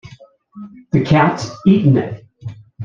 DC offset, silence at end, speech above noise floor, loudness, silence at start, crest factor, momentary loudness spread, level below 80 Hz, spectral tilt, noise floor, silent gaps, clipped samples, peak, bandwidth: under 0.1%; 0 s; 29 dB; -15 LUFS; 0.05 s; 16 dB; 21 LU; -48 dBFS; -7.5 dB/octave; -44 dBFS; none; under 0.1%; -2 dBFS; 7.4 kHz